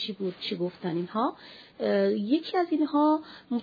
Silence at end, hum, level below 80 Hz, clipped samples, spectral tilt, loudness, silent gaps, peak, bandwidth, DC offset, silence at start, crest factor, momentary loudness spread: 0 s; none; -76 dBFS; under 0.1%; -8 dB/octave; -28 LUFS; none; -14 dBFS; 5 kHz; under 0.1%; 0 s; 14 dB; 9 LU